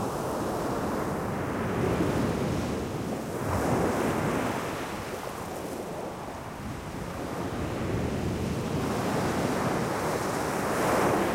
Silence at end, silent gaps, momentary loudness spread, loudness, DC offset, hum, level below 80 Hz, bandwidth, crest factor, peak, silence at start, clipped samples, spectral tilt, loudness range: 0 s; none; 9 LU; -30 LUFS; under 0.1%; none; -46 dBFS; 16 kHz; 16 dB; -14 dBFS; 0 s; under 0.1%; -5.5 dB/octave; 5 LU